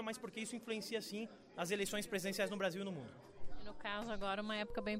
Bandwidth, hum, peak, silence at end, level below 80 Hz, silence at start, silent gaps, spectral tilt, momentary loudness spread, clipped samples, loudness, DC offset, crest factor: 16 kHz; none; -26 dBFS; 0 s; -60 dBFS; 0 s; none; -4 dB/octave; 14 LU; under 0.1%; -42 LUFS; under 0.1%; 16 dB